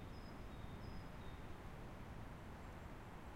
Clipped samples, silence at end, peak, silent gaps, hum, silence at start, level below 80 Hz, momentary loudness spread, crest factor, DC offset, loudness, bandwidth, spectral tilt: under 0.1%; 0 s; -38 dBFS; none; none; 0 s; -56 dBFS; 2 LU; 14 dB; under 0.1%; -55 LUFS; 16 kHz; -6.5 dB/octave